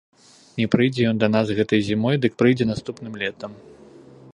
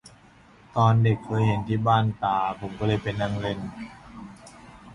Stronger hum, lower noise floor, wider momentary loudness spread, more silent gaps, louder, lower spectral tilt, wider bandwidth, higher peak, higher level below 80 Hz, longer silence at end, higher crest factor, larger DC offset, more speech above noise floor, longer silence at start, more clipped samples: neither; second, -46 dBFS vs -53 dBFS; second, 14 LU vs 20 LU; neither; first, -21 LUFS vs -25 LUFS; about the same, -7 dB/octave vs -7.5 dB/octave; about the same, 10.5 kHz vs 11 kHz; first, -2 dBFS vs -6 dBFS; about the same, -54 dBFS vs -50 dBFS; first, 0.8 s vs 0 s; about the same, 20 dB vs 18 dB; neither; second, 25 dB vs 29 dB; first, 0.55 s vs 0.05 s; neither